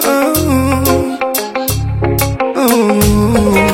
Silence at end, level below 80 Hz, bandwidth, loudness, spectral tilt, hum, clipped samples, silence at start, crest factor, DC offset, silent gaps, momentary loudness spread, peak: 0 s; -26 dBFS; 17 kHz; -12 LUFS; -5 dB/octave; none; under 0.1%; 0 s; 12 dB; under 0.1%; none; 6 LU; 0 dBFS